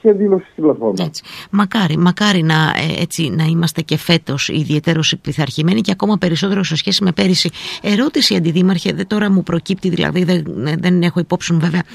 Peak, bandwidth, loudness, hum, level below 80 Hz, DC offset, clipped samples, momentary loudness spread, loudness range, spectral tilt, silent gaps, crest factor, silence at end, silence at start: 0 dBFS; 14.5 kHz; -15 LUFS; none; -50 dBFS; under 0.1%; under 0.1%; 6 LU; 1 LU; -5.5 dB/octave; none; 14 dB; 0 s; 0.05 s